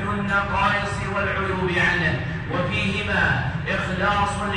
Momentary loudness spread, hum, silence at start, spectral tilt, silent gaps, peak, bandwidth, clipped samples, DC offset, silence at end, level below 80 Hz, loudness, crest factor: 5 LU; none; 0 s; -5.5 dB/octave; none; -8 dBFS; 10.5 kHz; under 0.1%; under 0.1%; 0 s; -38 dBFS; -22 LUFS; 16 dB